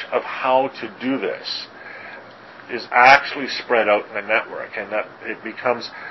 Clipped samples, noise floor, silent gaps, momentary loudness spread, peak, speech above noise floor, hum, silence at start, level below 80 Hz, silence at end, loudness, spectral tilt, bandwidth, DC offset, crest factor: under 0.1%; -41 dBFS; none; 21 LU; 0 dBFS; 21 dB; none; 0 s; -64 dBFS; 0 s; -20 LUFS; -4 dB/octave; 8 kHz; under 0.1%; 22 dB